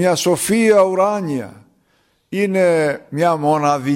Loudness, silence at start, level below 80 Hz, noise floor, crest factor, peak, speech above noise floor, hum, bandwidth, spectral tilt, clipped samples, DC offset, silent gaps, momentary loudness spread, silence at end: -16 LUFS; 0 s; -58 dBFS; -61 dBFS; 14 dB; -2 dBFS; 45 dB; none; 16.5 kHz; -5 dB/octave; under 0.1%; under 0.1%; none; 11 LU; 0 s